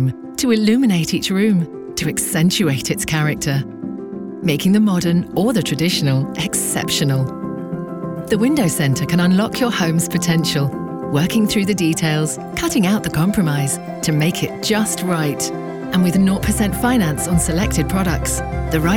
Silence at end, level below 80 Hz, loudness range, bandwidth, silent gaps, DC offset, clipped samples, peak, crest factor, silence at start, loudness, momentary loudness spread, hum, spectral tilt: 0 s; -36 dBFS; 2 LU; 18.5 kHz; none; under 0.1%; under 0.1%; -2 dBFS; 14 dB; 0 s; -18 LUFS; 7 LU; none; -5 dB/octave